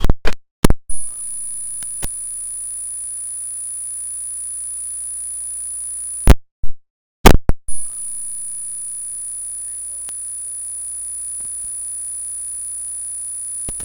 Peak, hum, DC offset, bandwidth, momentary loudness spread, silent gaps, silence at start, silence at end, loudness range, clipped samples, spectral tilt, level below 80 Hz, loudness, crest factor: 0 dBFS; 50 Hz at -45 dBFS; under 0.1%; 19 kHz; 7 LU; 0.51-0.63 s, 6.51-6.63 s, 6.90-7.24 s; 0 s; 0 s; 5 LU; under 0.1%; -3.5 dB/octave; -24 dBFS; -22 LUFS; 18 dB